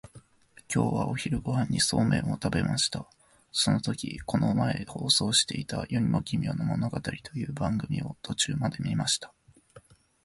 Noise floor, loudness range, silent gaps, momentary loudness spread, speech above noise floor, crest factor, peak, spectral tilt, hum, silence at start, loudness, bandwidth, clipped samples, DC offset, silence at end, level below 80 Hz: -58 dBFS; 4 LU; none; 9 LU; 30 dB; 18 dB; -10 dBFS; -4 dB/octave; none; 0.05 s; -28 LUFS; 11.5 kHz; under 0.1%; under 0.1%; 0.45 s; -50 dBFS